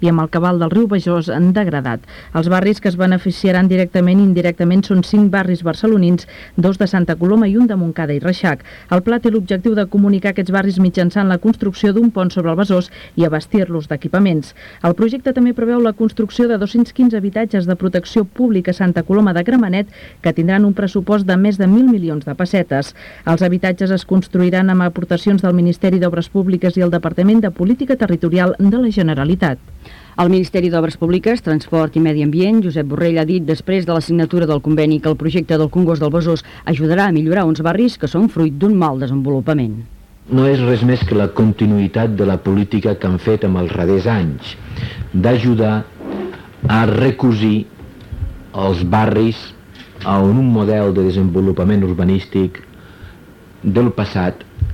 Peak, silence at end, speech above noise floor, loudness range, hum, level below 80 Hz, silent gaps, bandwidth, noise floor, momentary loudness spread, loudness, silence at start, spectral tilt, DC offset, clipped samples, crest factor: -4 dBFS; 0 s; 27 dB; 3 LU; none; -40 dBFS; none; 9.6 kHz; -41 dBFS; 7 LU; -15 LUFS; 0 s; -8.5 dB/octave; under 0.1%; under 0.1%; 10 dB